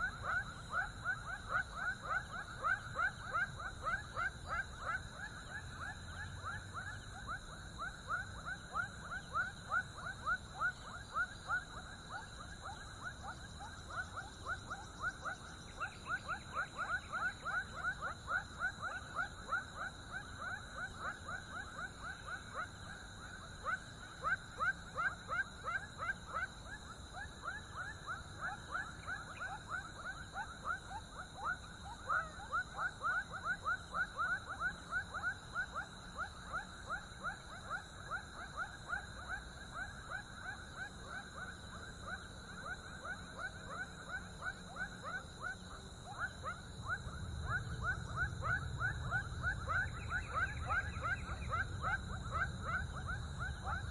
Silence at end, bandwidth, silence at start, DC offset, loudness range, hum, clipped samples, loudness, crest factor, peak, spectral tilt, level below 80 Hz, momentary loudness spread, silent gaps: 0 s; 11.5 kHz; 0 s; under 0.1%; 6 LU; none; under 0.1%; -42 LUFS; 18 dB; -26 dBFS; -4 dB/octave; -56 dBFS; 9 LU; none